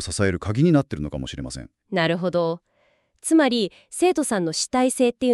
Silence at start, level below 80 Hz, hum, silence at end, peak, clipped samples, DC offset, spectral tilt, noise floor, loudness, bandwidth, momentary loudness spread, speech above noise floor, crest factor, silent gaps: 0 s; -46 dBFS; none; 0 s; -4 dBFS; under 0.1%; under 0.1%; -5 dB/octave; -65 dBFS; -22 LUFS; 13.5 kHz; 13 LU; 43 dB; 18 dB; none